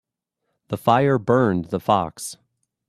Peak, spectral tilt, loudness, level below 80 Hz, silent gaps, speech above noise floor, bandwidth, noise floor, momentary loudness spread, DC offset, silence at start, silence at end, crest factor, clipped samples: -2 dBFS; -6 dB/octave; -20 LUFS; -58 dBFS; none; 58 dB; 14 kHz; -78 dBFS; 14 LU; under 0.1%; 0.7 s; 0.55 s; 20 dB; under 0.1%